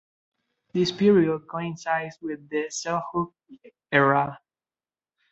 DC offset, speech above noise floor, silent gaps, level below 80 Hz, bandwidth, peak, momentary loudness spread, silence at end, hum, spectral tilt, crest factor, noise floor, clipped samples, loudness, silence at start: under 0.1%; over 66 dB; none; -64 dBFS; 8.2 kHz; -4 dBFS; 13 LU; 0.95 s; none; -5.5 dB/octave; 22 dB; under -90 dBFS; under 0.1%; -25 LUFS; 0.75 s